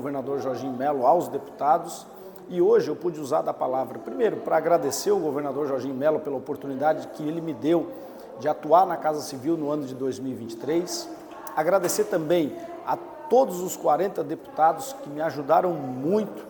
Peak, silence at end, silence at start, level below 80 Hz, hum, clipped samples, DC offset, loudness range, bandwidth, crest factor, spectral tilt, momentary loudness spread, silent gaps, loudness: -6 dBFS; 0 s; 0 s; -68 dBFS; none; under 0.1%; under 0.1%; 2 LU; 19 kHz; 20 dB; -5 dB/octave; 11 LU; none; -25 LUFS